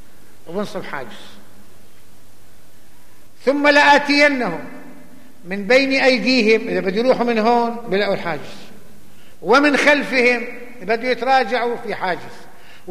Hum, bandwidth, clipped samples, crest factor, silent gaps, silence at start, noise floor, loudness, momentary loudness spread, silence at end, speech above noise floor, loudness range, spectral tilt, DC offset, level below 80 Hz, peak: none; 15 kHz; under 0.1%; 16 dB; none; 0.45 s; -50 dBFS; -16 LUFS; 18 LU; 0 s; 33 dB; 4 LU; -4 dB/octave; 3%; -60 dBFS; -2 dBFS